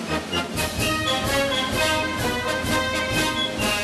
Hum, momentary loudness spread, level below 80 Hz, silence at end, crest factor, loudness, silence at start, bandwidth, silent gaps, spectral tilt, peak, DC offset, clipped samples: none; 4 LU; -40 dBFS; 0 s; 16 dB; -22 LUFS; 0 s; 13 kHz; none; -3 dB/octave; -8 dBFS; under 0.1%; under 0.1%